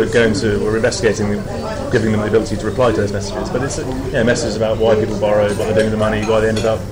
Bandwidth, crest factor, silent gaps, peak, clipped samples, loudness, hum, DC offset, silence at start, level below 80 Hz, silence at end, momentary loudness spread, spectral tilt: 16 kHz; 12 dB; none; -4 dBFS; under 0.1%; -17 LUFS; none; under 0.1%; 0 s; -32 dBFS; 0 s; 6 LU; -5.5 dB/octave